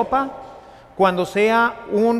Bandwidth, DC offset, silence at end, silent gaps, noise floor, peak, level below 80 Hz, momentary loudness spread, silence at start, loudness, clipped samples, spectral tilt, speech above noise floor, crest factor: 14.5 kHz; under 0.1%; 0 s; none; -42 dBFS; -2 dBFS; -52 dBFS; 17 LU; 0 s; -19 LUFS; under 0.1%; -6 dB/octave; 24 dB; 16 dB